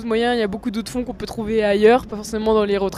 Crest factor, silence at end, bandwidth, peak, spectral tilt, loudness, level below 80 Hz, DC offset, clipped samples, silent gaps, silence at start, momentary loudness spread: 16 dB; 0 s; 14.5 kHz; -2 dBFS; -5 dB/octave; -20 LUFS; -42 dBFS; under 0.1%; under 0.1%; none; 0 s; 12 LU